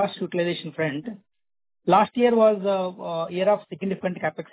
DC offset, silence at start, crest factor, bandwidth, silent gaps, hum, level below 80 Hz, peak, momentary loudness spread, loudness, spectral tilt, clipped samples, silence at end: under 0.1%; 0 s; 18 dB; 4 kHz; none; none; -68 dBFS; -6 dBFS; 12 LU; -23 LUFS; -10 dB/octave; under 0.1%; 0.1 s